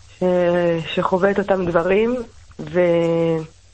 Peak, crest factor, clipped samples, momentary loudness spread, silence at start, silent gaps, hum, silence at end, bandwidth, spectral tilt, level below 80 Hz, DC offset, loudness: -4 dBFS; 16 dB; under 0.1%; 8 LU; 0.2 s; none; none; 0.25 s; 8.6 kHz; -7.5 dB/octave; -48 dBFS; 0.2%; -19 LUFS